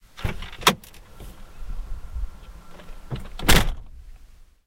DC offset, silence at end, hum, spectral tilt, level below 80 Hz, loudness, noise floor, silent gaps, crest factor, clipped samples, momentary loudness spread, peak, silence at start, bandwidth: under 0.1%; 0.25 s; none; -3 dB/octave; -30 dBFS; -24 LUFS; -48 dBFS; none; 24 dB; under 0.1%; 27 LU; 0 dBFS; 0.15 s; 16.5 kHz